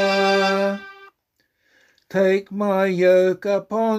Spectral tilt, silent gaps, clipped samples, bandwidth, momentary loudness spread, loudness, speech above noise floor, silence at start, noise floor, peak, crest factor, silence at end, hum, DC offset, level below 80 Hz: -5.5 dB/octave; none; under 0.1%; 13 kHz; 8 LU; -19 LUFS; 52 dB; 0 s; -70 dBFS; -6 dBFS; 16 dB; 0 s; none; under 0.1%; -68 dBFS